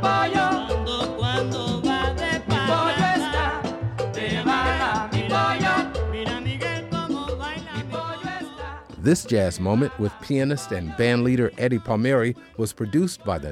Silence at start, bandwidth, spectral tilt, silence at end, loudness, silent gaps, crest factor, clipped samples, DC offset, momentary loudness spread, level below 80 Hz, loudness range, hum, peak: 0 s; 15 kHz; -5.5 dB/octave; 0 s; -24 LUFS; none; 16 dB; under 0.1%; under 0.1%; 9 LU; -38 dBFS; 4 LU; none; -8 dBFS